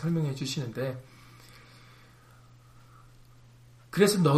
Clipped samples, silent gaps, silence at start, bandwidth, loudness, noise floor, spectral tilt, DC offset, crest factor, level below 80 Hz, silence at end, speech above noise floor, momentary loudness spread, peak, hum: under 0.1%; none; 0 s; 15.5 kHz; -29 LUFS; -55 dBFS; -5.5 dB/octave; under 0.1%; 22 dB; -62 dBFS; 0 s; 29 dB; 28 LU; -10 dBFS; none